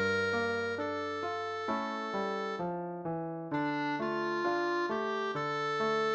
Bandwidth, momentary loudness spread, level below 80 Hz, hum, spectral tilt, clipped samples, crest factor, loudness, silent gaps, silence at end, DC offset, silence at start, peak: 8.4 kHz; 6 LU; -74 dBFS; none; -5.5 dB/octave; under 0.1%; 14 dB; -34 LUFS; none; 0 s; under 0.1%; 0 s; -20 dBFS